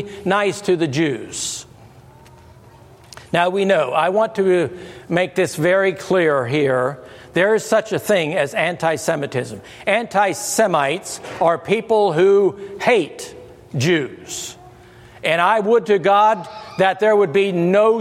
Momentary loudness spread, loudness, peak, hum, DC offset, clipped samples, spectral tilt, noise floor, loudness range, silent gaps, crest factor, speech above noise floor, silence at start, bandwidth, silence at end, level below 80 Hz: 11 LU; -18 LUFS; 0 dBFS; none; under 0.1%; under 0.1%; -4.5 dB/octave; -45 dBFS; 4 LU; none; 18 dB; 27 dB; 0 s; 15.5 kHz; 0 s; -58 dBFS